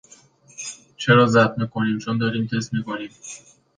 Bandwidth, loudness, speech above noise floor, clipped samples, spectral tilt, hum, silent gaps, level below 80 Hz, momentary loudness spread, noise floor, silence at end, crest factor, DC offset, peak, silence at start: 9.8 kHz; -20 LUFS; 31 dB; under 0.1%; -5.5 dB/octave; none; none; -60 dBFS; 19 LU; -52 dBFS; 0.4 s; 20 dB; under 0.1%; -2 dBFS; 0.6 s